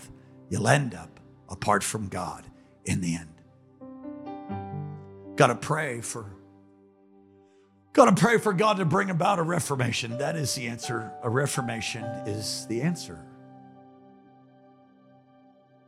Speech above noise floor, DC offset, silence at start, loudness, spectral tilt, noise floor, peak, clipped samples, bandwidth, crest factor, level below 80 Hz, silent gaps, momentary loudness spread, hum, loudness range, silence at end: 34 dB; under 0.1%; 0 s; -26 LUFS; -5 dB/octave; -60 dBFS; -4 dBFS; under 0.1%; 16 kHz; 26 dB; -64 dBFS; none; 18 LU; none; 11 LU; 2.05 s